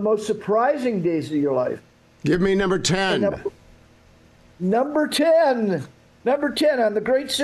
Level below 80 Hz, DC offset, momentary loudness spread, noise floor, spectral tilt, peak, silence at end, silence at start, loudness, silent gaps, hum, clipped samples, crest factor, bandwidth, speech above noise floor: -50 dBFS; under 0.1%; 11 LU; -52 dBFS; -5 dB/octave; -8 dBFS; 0 s; 0 s; -21 LUFS; none; none; under 0.1%; 14 dB; 12.5 kHz; 32 dB